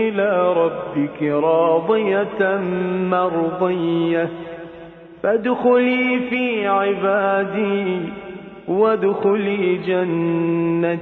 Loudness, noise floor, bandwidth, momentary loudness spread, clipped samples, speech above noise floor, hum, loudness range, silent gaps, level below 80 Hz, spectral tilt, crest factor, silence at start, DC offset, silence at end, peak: -19 LUFS; -39 dBFS; 4.3 kHz; 9 LU; under 0.1%; 21 dB; none; 2 LU; none; -58 dBFS; -9.5 dB/octave; 14 dB; 0 s; under 0.1%; 0 s; -6 dBFS